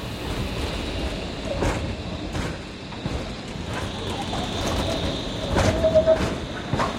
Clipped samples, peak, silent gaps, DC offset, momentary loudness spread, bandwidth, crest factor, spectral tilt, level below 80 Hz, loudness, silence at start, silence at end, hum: under 0.1%; -6 dBFS; none; under 0.1%; 11 LU; 16.5 kHz; 18 dB; -5.5 dB/octave; -36 dBFS; -26 LUFS; 0 s; 0 s; none